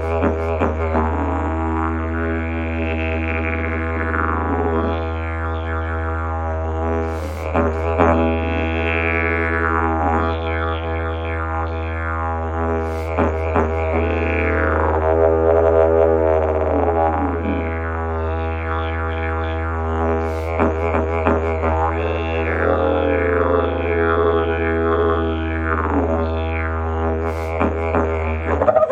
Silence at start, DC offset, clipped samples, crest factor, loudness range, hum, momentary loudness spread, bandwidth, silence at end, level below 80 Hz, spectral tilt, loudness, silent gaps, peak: 0 s; under 0.1%; under 0.1%; 18 dB; 5 LU; none; 7 LU; 7.2 kHz; 0 s; -28 dBFS; -8.5 dB/octave; -20 LUFS; none; -2 dBFS